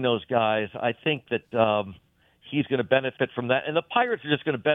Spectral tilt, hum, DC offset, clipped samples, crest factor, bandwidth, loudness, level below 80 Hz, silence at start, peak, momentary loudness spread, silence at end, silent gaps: -8.5 dB/octave; none; under 0.1%; under 0.1%; 20 dB; 4 kHz; -25 LUFS; -66 dBFS; 0 s; -4 dBFS; 5 LU; 0 s; none